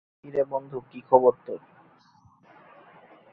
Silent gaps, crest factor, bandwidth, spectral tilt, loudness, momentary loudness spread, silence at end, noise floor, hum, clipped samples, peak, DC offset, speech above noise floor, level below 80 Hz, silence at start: none; 26 dB; 4 kHz; -10 dB/octave; -24 LUFS; 19 LU; 1.75 s; -59 dBFS; none; under 0.1%; -2 dBFS; under 0.1%; 34 dB; -72 dBFS; 0.25 s